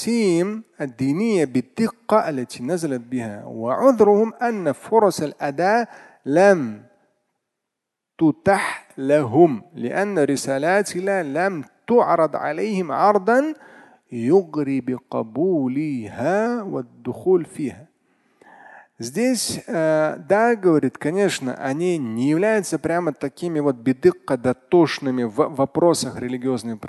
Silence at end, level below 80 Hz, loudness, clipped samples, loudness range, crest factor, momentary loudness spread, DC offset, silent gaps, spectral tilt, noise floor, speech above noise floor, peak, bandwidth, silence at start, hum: 0 s; -62 dBFS; -20 LUFS; under 0.1%; 4 LU; 20 dB; 11 LU; under 0.1%; none; -5.5 dB/octave; -82 dBFS; 62 dB; -2 dBFS; 12.5 kHz; 0 s; none